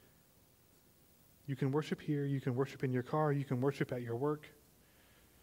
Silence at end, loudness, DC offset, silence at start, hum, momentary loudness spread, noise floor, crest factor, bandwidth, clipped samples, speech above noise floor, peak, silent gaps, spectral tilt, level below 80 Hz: 0.9 s; -37 LUFS; under 0.1%; 1.45 s; none; 8 LU; -67 dBFS; 18 dB; 16 kHz; under 0.1%; 31 dB; -20 dBFS; none; -8 dB/octave; -74 dBFS